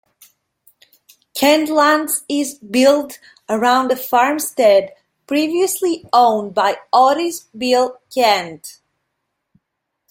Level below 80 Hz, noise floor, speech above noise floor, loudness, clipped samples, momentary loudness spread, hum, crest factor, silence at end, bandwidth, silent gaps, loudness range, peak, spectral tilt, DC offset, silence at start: -64 dBFS; -76 dBFS; 61 dB; -16 LUFS; under 0.1%; 10 LU; none; 16 dB; 1.4 s; 17 kHz; none; 2 LU; -2 dBFS; -2.5 dB/octave; under 0.1%; 1.35 s